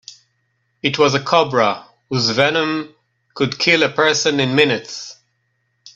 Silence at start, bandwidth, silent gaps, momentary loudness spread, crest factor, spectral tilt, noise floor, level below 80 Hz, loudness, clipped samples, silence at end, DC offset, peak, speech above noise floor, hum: 0.85 s; 8.2 kHz; none; 14 LU; 18 dB; -4 dB/octave; -68 dBFS; -60 dBFS; -16 LUFS; under 0.1%; 0.05 s; under 0.1%; 0 dBFS; 51 dB; none